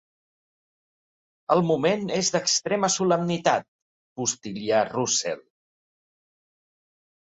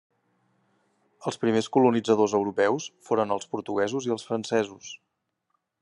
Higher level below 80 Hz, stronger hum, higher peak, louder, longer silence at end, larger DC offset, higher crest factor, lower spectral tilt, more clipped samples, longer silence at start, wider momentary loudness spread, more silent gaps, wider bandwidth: first, -68 dBFS vs -74 dBFS; neither; about the same, -6 dBFS vs -8 dBFS; about the same, -24 LUFS vs -26 LUFS; first, 2 s vs 0.85 s; neither; about the same, 22 dB vs 20 dB; second, -3.5 dB/octave vs -5 dB/octave; neither; first, 1.5 s vs 1.2 s; second, 9 LU vs 13 LU; first, 3.68-4.16 s vs none; second, 8.4 kHz vs 11 kHz